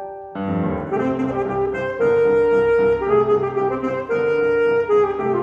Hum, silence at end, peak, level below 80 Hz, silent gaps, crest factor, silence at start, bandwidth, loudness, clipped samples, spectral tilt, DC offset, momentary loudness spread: none; 0 s; -6 dBFS; -46 dBFS; none; 12 dB; 0 s; 7 kHz; -19 LUFS; under 0.1%; -8.5 dB/octave; under 0.1%; 7 LU